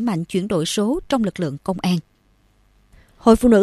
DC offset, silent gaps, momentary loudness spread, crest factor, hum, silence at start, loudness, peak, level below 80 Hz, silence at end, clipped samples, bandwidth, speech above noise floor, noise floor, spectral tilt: under 0.1%; none; 9 LU; 20 dB; none; 0 s; -20 LUFS; 0 dBFS; -42 dBFS; 0 s; under 0.1%; 14 kHz; 41 dB; -59 dBFS; -6 dB/octave